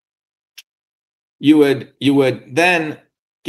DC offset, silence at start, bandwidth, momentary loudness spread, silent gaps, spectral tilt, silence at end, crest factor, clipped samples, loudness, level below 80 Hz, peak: under 0.1%; 1.4 s; 12.5 kHz; 8 LU; 3.19-3.43 s; -5.5 dB/octave; 0 s; 18 dB; under 0.1%; -15 LUFS; -66 dBFS; 0 dBFS